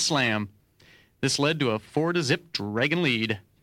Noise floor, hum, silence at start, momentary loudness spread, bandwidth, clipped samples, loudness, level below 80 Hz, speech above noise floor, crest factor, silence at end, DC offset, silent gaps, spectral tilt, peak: -57 dBFS; none; 0 s; 7 LU; 16.5 kHz; under 0.1%; -25 LUFS; -64 dBFS; 32 dB; 16 dB; 0.25 s; under 0.1%; none; -4 dB/octave; -10 dBFS